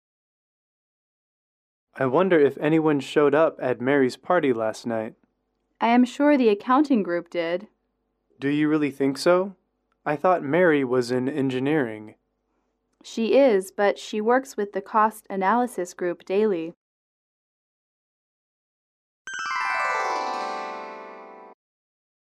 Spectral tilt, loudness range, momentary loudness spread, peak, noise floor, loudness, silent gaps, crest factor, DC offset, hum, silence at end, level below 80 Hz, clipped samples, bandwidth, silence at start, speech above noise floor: -6 dB/octave; 7 LU; 12 LU; -8 dBFS; -74 dBFS; -23 LUFS; 16.77-19.25 s; 16 dB; under 0.1%; none; 0.7 s; -74 dBFS; under 0.1%; 13.5 kHz; 1.95 s; 52 dB